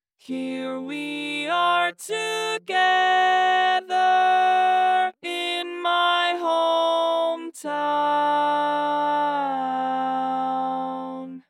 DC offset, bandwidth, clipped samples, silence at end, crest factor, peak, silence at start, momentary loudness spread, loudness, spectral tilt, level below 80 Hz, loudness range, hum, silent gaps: under 0.1%; 14.5 kHz; under 0.1%; 0.1 s; 14 dB; -10 dBFS; 0.3 s; 11 LU; -22 LUFS; -2.5 dB/octave; under -90 dBFS; 4 LU; none; none